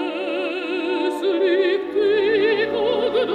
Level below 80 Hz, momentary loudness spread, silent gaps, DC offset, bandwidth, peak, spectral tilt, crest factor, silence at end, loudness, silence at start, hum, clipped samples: -58 dBFS; 6 LU; none; under 0.1%; 9.8 kHz; -8 dBFS; -5 dB/octave; 12 dB; 0 s; -20 LUFS; 0 s; none; under 0.1%